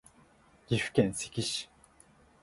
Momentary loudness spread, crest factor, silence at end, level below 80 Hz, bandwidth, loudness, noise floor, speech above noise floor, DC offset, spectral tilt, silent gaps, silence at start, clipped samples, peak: 8 LU; 24 dB; 0.8 s; -62 dBFS; 11.5 kHz; -32 LUFS; -62 dBFS; 31 dB; under 0.1%; -4.5 dB/octave; none; 0.7 s; under 0.1%; -10 dBFS